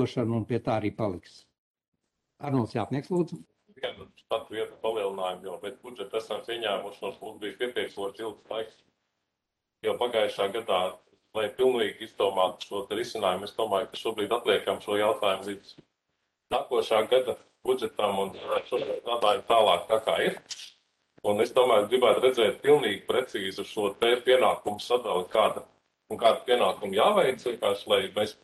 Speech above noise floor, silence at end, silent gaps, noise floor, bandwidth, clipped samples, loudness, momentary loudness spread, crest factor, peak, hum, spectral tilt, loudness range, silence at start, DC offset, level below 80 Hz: 57 dB; 0.1 s; 1.58-1.74 s, 1.88-1.92 s; -85 dBFS; 12.5 kHz; under 0.1%; -27 LUFS; 15 LU; 20 dB; -8 dBFS; none; -4.5 dB/octave; 9 LU; 0 s; under 0.1%; -68 dBFS